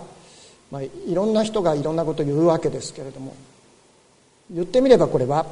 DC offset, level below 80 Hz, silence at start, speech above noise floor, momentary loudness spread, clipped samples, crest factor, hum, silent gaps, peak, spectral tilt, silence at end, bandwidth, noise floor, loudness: under 0.1%; -50 dBFS; 0 s; 36 dB; 19 LU; under 0.1%; 22 dB; none; none; 0 dBFS; -6.5 dB/octave; 0 s; 11 kHz; -57 dBFS; -20 LUFS